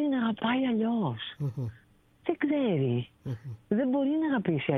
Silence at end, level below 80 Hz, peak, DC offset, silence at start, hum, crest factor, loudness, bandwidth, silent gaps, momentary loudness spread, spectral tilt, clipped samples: 0 s; -66 dBFS; -14 dBFS; under 0.1%; 0 s; none; 16 dB; -30 LUFS; 4 kHz; none; 11 LU; -9 dB/octave; under 0.1%